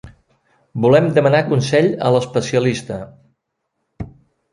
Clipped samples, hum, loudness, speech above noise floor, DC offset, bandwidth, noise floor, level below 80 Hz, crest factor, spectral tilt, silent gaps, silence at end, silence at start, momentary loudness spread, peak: under 0.1%; none; -16 LUFS; 59 dB; under 0.1%; 11.5 kHz; -74 dBFS; -50 dBFS; 16 dB; -6.5 dB/octave; none; 0.45 s; 0.05 s; 21 LU; -2 dBFS